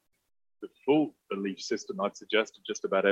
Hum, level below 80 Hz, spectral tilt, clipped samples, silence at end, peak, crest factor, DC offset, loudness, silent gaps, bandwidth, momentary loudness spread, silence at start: none; -80 dBFS; -4 dB/octave; under 0.1%; 0 s; -12 dBFS; 20 dB; under 0.1%; -31 LUFS; none; 8.2 kHz; 10 LU; 0.6 s